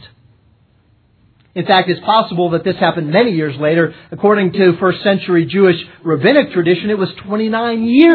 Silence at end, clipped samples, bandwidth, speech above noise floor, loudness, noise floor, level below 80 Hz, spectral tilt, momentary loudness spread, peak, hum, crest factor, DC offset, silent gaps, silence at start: 0 s; under 0.1%; 4.6 kHz; 41 dB; -14 LUFS; -53 dBFS; -56 dBFS; -9.5 dB/octave; 7 LU; 0 dBFS; none; 14 dB; under 0.1%; none; 0 s